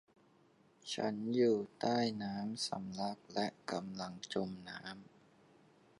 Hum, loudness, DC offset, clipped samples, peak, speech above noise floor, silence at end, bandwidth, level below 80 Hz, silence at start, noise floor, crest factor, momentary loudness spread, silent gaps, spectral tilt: none; -39 LUFS; under 0.1%; under 0.1%; -20 dBFS; 30 dB; 0.95 s; 11 kHz; -78 dBFS; 0.85 s; -69 dBFS; 20 dB; 14 LU; none; -5 dB/octave